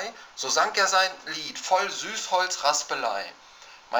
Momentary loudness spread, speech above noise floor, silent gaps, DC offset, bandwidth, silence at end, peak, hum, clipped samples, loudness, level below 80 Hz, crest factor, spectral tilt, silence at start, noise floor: 12 LU; 22 dB; none; under 0.1%; over 20 kHz; 0 s; -8 dBFS; none; under 0.1%; -25 LUFS; -72 dBFS; 20 dB; 0.5 dB/octave; 0 s; -48 dBFS